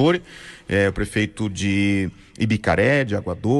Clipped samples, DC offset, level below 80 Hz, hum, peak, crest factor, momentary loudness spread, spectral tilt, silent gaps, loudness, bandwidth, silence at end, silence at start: under 0.1%; under 0.1%; -42 dBFS; none; -8 dBFS; 14 dB; 8 LU; -6 dB/octave; none; -21 LUFS; 12 kHz; 0 s; 0 s